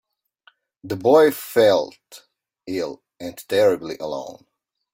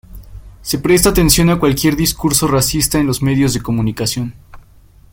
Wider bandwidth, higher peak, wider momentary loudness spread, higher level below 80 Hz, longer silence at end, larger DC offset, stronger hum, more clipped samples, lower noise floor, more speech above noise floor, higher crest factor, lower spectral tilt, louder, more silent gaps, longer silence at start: about the same, 17 kHz vs 17 kHz; second, -4 dBFS vs 0 dBFS; first, 19 LU vs 9 LU; second, -64 dBFS vs -30 dBFS; about the same, 0.6 s vs 0.55 s; neither; neither; neither; first, -59 dBFS vs -44 dBFS; first, 39 dB vs 31 dB; about the same, 18 dB vs 16 dB; about the same, -5 dB/octave vs -4.5 dB/octave; second, -20 LUFS vs -14 LUFS; neither; first, 0.85 s vs 0.1 s